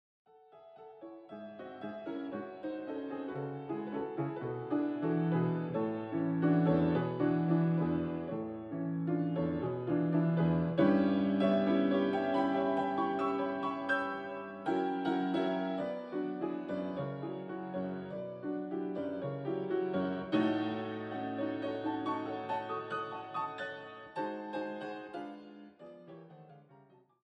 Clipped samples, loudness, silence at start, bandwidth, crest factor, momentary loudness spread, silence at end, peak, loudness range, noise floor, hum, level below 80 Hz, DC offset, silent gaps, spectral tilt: under 0.1%; -34 LUFS; 0.55 s; 5.8 kHz; 18 dB; 14 LU; 0.5 s; -16 dBFS; 11 LU; -62 dBFS; none; -68 dBFS; under 0.1%; none; -9 dB/octave